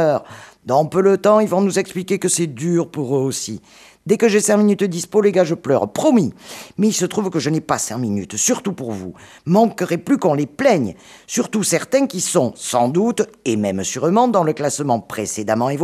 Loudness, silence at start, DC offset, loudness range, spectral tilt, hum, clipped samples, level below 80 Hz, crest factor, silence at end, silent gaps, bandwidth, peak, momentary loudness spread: -18 LUFS; 0 s; under 0.1%; 2 LU; -5 dB/octave; none; under 0.1%; -60 dBFS; 16 dB; 0 s; none; 15.5 kHz; -2 dBFS; 10 LU